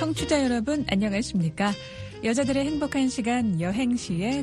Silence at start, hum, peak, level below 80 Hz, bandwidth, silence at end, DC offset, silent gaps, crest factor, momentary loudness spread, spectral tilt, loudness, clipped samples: 0 s; none; -8 dBFS; -46 dBFS; 11.5 kHz; 0 s; under 0.1%; none; 18 dB; 4 LU; -5.5 dB/octave; -26 LUFS; under 0.1%